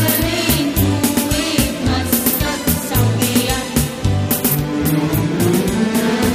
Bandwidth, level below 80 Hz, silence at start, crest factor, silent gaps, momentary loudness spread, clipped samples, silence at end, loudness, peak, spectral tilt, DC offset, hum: 15.5 kHz; -30 dBFS; 0 s; 16 dB; none; 3 LU; under 0.1%; 0 s; -16 LUFS; 0 dBFS; -4.5 dB/octave; under 0.1%; none